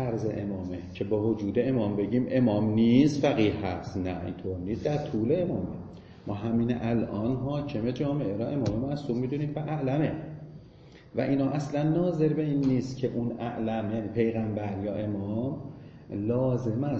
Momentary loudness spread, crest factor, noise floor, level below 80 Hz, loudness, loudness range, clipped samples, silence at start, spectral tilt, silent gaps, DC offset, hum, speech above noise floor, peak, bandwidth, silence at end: 10 LU; 18 dB; -51 dBFS; -54 dBFS; -29 LUFS; 5 LU; under 0.1%; 0 s; -8.5 dB/octave; none; under 0.1%; none; 23 dB; -10 dBFS; 7.6 kHz; 0 s